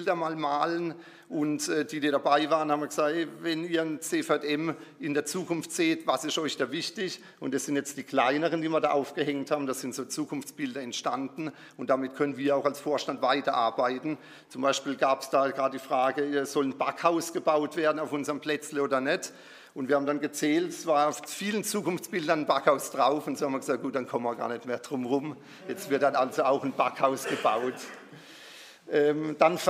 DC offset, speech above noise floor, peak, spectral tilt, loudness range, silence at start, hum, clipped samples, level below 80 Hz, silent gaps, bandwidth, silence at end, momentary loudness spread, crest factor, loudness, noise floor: under 0.1%; 21 dB; -8 dBFS; -4 dB/octave; 3 LU; 0 s; none; under 0.1%; -86 dBFS; none; 15.5 kHz; 0 s; 10 LU; 22 dB; -29 LUFS; -49 dBFS